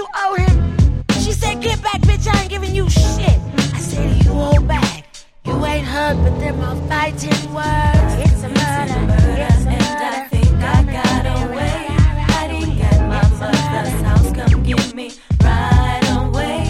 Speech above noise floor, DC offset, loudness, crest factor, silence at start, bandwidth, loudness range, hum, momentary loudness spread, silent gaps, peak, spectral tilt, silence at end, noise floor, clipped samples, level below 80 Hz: 23 dB; under 0.1%; -16 LUFS; 14 dB; 0 s; 14 kHz; 2 LU; none; 6 LU; none; 0 dBFS; -6 dB/octave; 0 s; -37 dBFS; under 0.1%; -20 dBFS